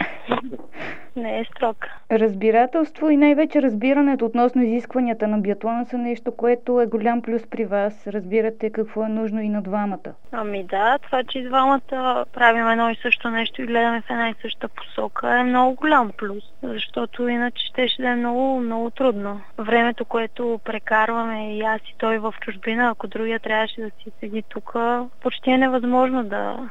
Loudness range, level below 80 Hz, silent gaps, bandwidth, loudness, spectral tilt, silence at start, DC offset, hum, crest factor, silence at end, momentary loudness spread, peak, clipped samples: 5 LU; -64 dBFS; none; 7.6 kHz; -21 LUFS; -7 dB/octave; 0 s; 2%; none; 22 dB; 0 s; 12 LU; 0 dBFS; under 0.1%